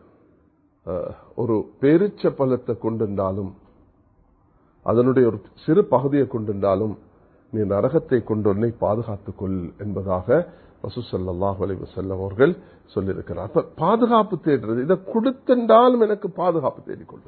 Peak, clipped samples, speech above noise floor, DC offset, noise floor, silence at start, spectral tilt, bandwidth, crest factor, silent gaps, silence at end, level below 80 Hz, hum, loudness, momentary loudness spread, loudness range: -2 dBFS; under 0.1%; 39 dB; under 0.1%; -60 dBFS; 0.85 s; -12.5 dB/octave; 4.5 kHz; 20 dB; none; 0.1 s; -48 dBFS; none; -22 LUFS; 13 LU; 6 LU